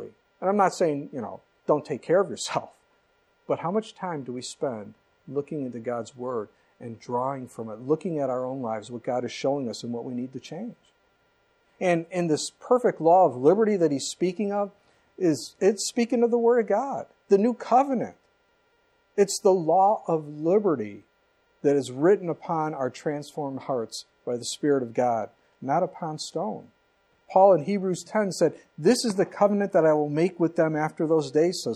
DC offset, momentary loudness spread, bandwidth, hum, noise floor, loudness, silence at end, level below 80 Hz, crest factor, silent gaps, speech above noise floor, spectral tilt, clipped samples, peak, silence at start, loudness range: under 0.1%; 13 LU; 13.5 kHz; none; -66 dBFS; -25 LUFS; 0 s; -76 dBFS; 20 dB; none; 42 dB; -5.5 dB/octave; under 0.1%; -6 dBFS; 0 s; 9 LU